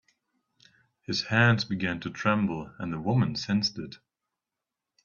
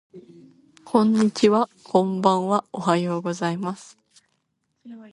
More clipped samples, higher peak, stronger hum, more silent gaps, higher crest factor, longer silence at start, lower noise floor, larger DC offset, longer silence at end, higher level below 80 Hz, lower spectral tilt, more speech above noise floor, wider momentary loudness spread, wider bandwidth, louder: neither; second, -8 dBFS vs -2 dBFS; neither; neither; about the same, 22 dB vs 22 dB; first, 1.1 s vs 0.15 s; first, -88 dBFS vs -74 dBFS; neither; first, 1.1 s vs 0.05 s; first, -62 dBFS vs -68 dBFS; about the same, -5.5 dB/octave vs -6.5 dB/octave; first, 61 dB vs 52 dB; first, 13 LU vs 8 LU; second, 7.2 kHz vs 11.5 kHz; second, -27 LUFS vs -22 LUFS